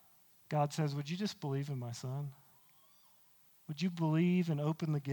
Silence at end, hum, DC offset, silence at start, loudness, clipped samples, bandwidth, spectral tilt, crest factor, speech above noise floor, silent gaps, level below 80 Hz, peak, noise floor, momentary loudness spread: 0 s; none; under 0.1%; 0.5 s; -36 LUFS; under 0.1%; 19 kHz; -7 dB/octave; 18 dB; 31 dB; none; -82 dBFS; -20 dBFS; -66 dBFS; 11 LU